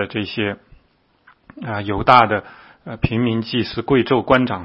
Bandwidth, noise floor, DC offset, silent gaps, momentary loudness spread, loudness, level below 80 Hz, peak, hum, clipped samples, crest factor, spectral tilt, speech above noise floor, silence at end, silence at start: 7 kHz; -59 dBFS; under 0.1%; none; 18 LU; -18 LUFS; -42 dBFS; 0 dBFS; none; under 0.1%; 20 dB; -8 dB/octave; 41 dB; 0 s; 0 s